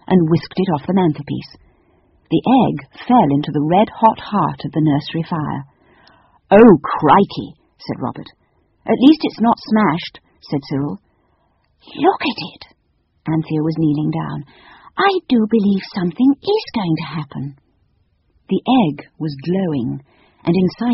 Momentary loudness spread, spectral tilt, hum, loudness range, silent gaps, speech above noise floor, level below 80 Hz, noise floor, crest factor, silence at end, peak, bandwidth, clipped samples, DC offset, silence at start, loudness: 16 LU; -6 dB/octave; none; 6 LU; none; 47 dB; -50 dBFS; -63 dBFS; 18 dB; 0 s; 0 dBFS; 6 kHz; under 0.1%; under 0.1%; 0.1 s; -17 LUFS